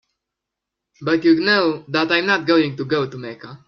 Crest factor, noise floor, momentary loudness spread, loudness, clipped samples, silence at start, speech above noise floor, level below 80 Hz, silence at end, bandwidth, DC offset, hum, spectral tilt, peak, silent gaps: 18 dB; -83 dBFS; 13 LU; -18 LUFS; under 0.1%; 1 s; 64 dB; -64 dBFS; 0.1 s; 6.4 kHz; under 0.1%; none; -6 dB/octave; -2 dBFS; none